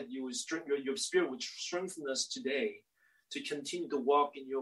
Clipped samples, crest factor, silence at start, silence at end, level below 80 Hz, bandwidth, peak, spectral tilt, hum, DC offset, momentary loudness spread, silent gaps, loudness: under 0.1%; 20 dB; 0 s; 0 s; -88 dBFS; 12.5 kHz; -16 dBFS; -2 dB/octave; none; under 0.1%; 9 LU; none; -35 LUFS